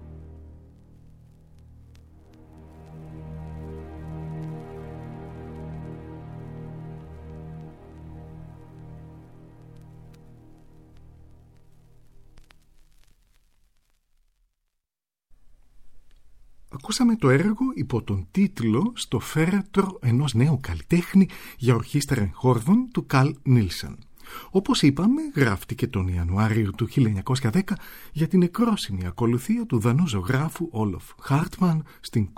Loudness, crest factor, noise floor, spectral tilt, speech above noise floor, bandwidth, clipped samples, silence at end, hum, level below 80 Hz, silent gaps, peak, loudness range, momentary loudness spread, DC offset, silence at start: -24 LUFS; 22 dB; -90 dBFS; -6.5 dB/octave; 67 dB; 16.5 kHz; under 0.1%; 0.05 s; none; -46 dBFS; none; -4 dBFS; 20 LU; 22 LU; under 0.1%; 0 s